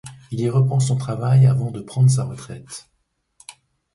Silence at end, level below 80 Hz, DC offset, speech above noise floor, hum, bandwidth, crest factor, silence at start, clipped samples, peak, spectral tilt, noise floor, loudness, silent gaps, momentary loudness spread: 0.45 s; -54 dBFS; under 0.1%; 38 dB; none; 11.5 kHz; 14 dB; 0.05 s; under 0.1%; -6 dBFS; -7 dB/octave; -56 dBFS; -19 LUFS; none; 20 LU